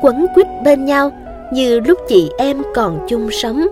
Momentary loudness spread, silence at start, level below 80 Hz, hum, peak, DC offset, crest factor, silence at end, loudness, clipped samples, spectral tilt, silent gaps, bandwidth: 7 LU; 0 s; -38 dBFS; none; 0 dBFS; under 0.1%; 14 dB; 0 s; -14 LUFS; under 0.1%; -5 dB/octave; none; 15.5 kHz